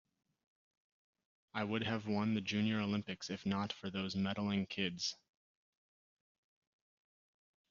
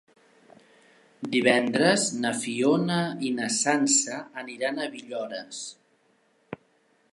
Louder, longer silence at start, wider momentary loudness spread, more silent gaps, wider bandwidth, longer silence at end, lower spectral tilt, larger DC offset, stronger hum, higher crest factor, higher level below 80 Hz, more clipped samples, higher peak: second, -38 LUFS vs -25 LUFS; first, 1.55 s vs 1.2 s; second, 6 LU vs 18 LU; neither; second, 7.4 kHz vs 11.5 kHz; first, 2.55 s vs 0.55 s; first, -4.5 dB/octave vs -3 dB/octave; neither; neither; about the same, 20 dB vs 22 dB; about the same, -76 dBFS vs -76 dBFS; neither; second, -20 dBFS vs -6 dBFS